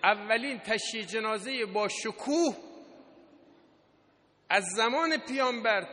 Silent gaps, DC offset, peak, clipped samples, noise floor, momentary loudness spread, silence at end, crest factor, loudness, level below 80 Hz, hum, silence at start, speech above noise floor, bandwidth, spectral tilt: none; under 0.1%; -8 dBFS; under 0.1%; -66 dBFS; 6 LU; 0 s; 22 dB; -29 LUFS; -78 dBFS; none; 0 s; 36 dB; 10.5 kHz; -2.5 dB/octave